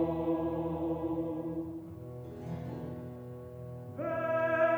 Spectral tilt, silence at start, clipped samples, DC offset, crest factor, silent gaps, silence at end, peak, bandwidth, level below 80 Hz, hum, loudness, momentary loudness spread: -9 dB/octave; 0 s; under 0.1%; under 0.1%; 16 dB; none; 0 s; -18 dBFS; over 20 kHz; -58 dBFS; none; -36 LUFS; 14 LU